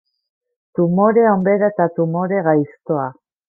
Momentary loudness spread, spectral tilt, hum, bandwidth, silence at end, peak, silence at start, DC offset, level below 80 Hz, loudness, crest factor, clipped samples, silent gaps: 9 LU; -13.5 dB/octave; none; 2.3 kHz; 0.35 s; -2 dBFS; 0.75 s; under 0.1%; -64 dBFS; -17 LUFS; 16 dB; under 0.1%; none